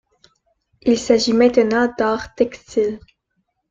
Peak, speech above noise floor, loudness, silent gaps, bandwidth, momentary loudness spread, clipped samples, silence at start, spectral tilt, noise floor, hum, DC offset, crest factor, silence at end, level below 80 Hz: -2 dBFS; 54 dB; -18 LUFS; none; 7.8 kHz; 9 LU; under 0.1%; 0.85 s; -4 dB/octave; -71 dBFS; none; under 0.1%; 18 dB; 0.7 s; -52 dBFS